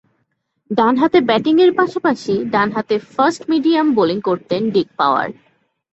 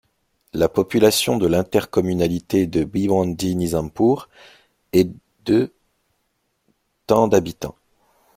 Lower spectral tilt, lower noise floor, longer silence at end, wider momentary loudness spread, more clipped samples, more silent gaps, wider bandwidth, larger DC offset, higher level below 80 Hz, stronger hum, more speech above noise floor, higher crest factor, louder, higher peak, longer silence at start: about the same, -6 dB/octave vs -5.5 dB/octave; about the same, -69 dBFS vs -70 dBFS; about the same, 0.6 s vs 0.65 s; second, 7 LU vs 10 LU; neither; neither; second, 8.2 kHz vs 16.5 kHz; neither; second, -58 dBFS vs -50 dBFS; neither; about the same, 53 dB vs 52 dB; second, 14 dB vs 20 dB; first, -16 LUFS vs -20 LUFS; about the same, -2 dBFS vs -2 dBFS; first, 0.7 s vs 0.55 s